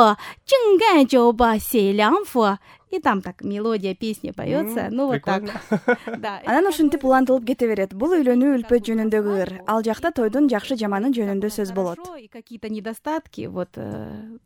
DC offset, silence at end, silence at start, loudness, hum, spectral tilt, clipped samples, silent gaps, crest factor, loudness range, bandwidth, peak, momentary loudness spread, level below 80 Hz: under 0.1%; 0.1 s; 0 s; -21 LUFS; none; -5.5 dB/octave; under 0.1%; none; 20 dB; 6 LU; over 20 kHz; 0 dBFS; 14 LU; -52 dBFS